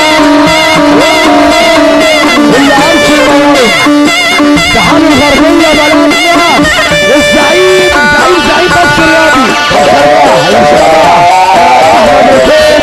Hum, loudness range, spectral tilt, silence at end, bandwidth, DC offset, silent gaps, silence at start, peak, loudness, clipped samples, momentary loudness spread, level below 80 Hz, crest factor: none; 1 LU; -3.5 dB/octave; 0 s; 15.5 kHz; under 0.1%; none; 0 s; 0 dBFS; -4 LUFS; 0.4%; 1 LU; -28 dBFS; 4 dB